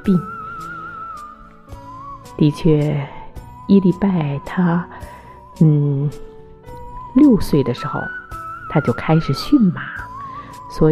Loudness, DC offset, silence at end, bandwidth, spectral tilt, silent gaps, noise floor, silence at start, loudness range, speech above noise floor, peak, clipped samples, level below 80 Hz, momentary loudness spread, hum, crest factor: -17 LUFS; under 0.1%; 0 s; 13.5 kHz; -8.5 dB/octave; none; -39 dBFS; 0 s; 3 LU; 23 dB; -2 dBFS; under 0.1%; -38 dBFS; 22 LU; none; 16 dB